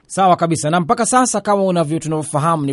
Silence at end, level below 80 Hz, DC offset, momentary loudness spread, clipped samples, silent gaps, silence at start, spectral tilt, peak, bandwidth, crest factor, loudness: 0 s; -56 dBFS; under 0.1%; 5 LU; under 0.1%; none; 0.1 s; -5 dB/octave; -2 dBFS; 11.5 kHz; 14 dB; -16 LUFS